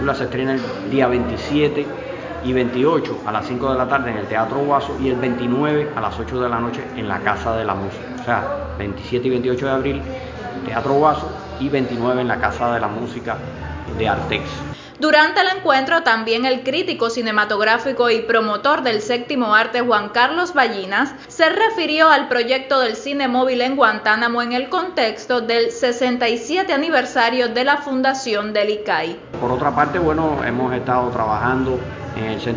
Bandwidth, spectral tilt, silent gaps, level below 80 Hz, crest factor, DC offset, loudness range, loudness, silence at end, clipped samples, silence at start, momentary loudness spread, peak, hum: 7.6 kHz; -5 dB/octave; none; -42 dBFS; 18 dB; under 0.1%; 5 LU; -19 LUFS; 0 s; under 0.1%; 0 s; 10 LU; 0 dBFS; none